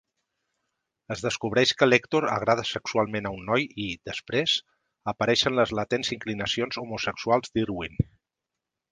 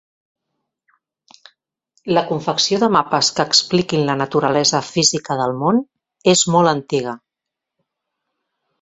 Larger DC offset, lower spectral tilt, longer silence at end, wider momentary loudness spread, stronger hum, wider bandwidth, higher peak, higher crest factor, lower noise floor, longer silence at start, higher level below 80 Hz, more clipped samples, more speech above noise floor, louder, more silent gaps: neither; about the same, -4.5 dB/octave vs -3.5 dB/octave; second, 0.9 s vs 1.65 s; first, 10 LU vs 7 LU; neither; first, 10 kHz vs 8.2 kHz; about the same, -4 dBFS vs -2 dBFS; first, 24 dB vs 18 dB; about the same, -86 dBFS vs -83 dBFS; second, 1.1 s vs 2.05 s; first, -52 dBFS vs -58 dBFS; neither; second, 60 dB vs 66 dB; second, -26 LUFS vs -16 LUFS; neither